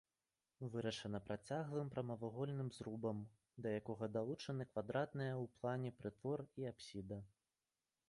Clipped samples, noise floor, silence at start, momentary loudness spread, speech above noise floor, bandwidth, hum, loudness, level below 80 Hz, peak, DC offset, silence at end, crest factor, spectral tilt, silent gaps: under 0.1%; under -90 dBFS; 0.6 s; 7 LU; over 44 dB; 11.5 kHz; none; -46 LUFS; -74 dBFS; -28 dBFS; under 0.1%; 0.8 s; 18 dB; -7 dB/octave; none